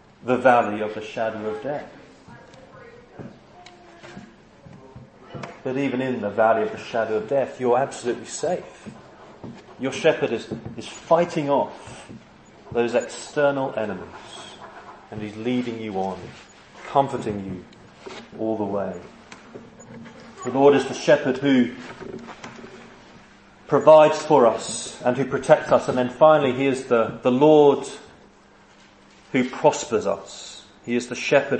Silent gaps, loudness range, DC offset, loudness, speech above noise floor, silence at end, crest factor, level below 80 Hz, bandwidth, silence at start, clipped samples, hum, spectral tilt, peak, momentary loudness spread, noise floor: none; 12 LU; under 0.1%; -21 LUFS; 31 dB; 0 s; 22 dB; -62 dBFS; 8.8 kHz; 0.25 s; under 0.1%; none; -5.5 dB/octave; 0 dBFS; 24 LU; -52 dBFS